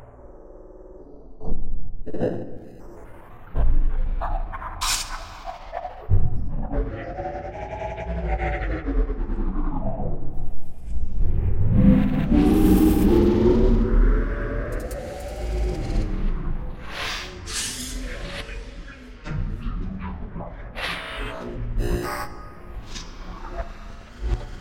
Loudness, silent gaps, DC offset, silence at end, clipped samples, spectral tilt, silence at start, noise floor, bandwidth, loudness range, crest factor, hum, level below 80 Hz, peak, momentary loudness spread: -26 LUFS; none; under 0.1%; 0 s; under 0.1%; -6 dB/octave; 0 s; -43 dBFS; 16.5 kHz; 13 LU; 18 dB; none; -26 dBFS; -4 dBFS; 22 LU